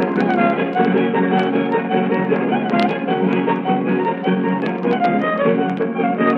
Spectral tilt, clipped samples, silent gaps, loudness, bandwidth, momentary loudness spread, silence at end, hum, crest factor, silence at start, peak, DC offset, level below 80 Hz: -8.5 dB/octave; under 0.1%; none; -18 LUFS; 6 kHz; 3 LU; 0 s; none; 16 dB; 0 s; -2 dBFS; under 0.1%; -70 dBFS